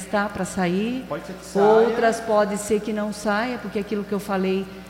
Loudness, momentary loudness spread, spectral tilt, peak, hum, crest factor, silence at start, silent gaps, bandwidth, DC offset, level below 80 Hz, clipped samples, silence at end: -23 LUFS; 10 LU; -5.5 dB/octave; -6 dBFS; none; 16 dB; 0 s; none; 16.5 kHz; under 0.1%; -52 dBFS; under 0.1%; 0 s